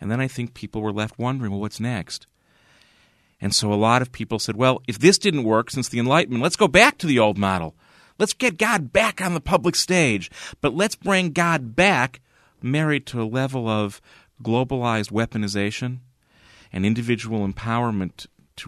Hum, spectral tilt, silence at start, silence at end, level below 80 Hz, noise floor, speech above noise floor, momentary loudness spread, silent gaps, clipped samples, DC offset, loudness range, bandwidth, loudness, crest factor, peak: none; -4.5 dB/octave; 0 s; 0 s; -50 dBFS; -60 dBFS; 38 dB; 12 LU; none; under 0.1%; under 0.1%; 7 LU; 13.5 kHz; -21 LUFS; 22 dB; 0 dBFS